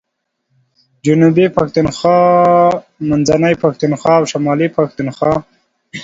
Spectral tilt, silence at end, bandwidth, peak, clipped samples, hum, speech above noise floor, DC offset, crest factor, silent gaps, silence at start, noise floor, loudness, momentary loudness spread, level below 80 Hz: -6.5 dB/octave; 0 s; 7.8 kHz; 0 dBFS; under 0.1%; none; 59 dB; under 0.1%; 14 dB; none; 1.05 s; -71 dBFS; -13 LUFS; 8 LU; -46 dBFS